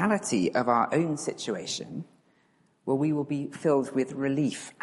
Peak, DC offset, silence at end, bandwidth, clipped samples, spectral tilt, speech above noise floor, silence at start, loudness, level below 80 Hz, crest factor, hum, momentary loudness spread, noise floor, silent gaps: -10 dBFS; under 0.1%; 0.1 s; 11.5 kHz; under 0.1%; -5 dB/octave; 39 dB; 0 s; -28 LUFS; -70 dBFS; 18 dB; none; 10 LU; -66 dBFS; none